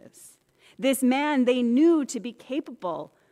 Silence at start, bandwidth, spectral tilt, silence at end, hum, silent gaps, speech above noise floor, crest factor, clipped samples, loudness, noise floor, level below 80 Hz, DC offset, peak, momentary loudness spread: 0.25 s; 15.5 kHz; -4 dB/octave; 0.25 s; none; none; 34 dB; 14 dB; under 0.1%; -24 LUFS; -58 dBFS; -76 dBFS; under 0.1%; -12 dBFS; 13 LU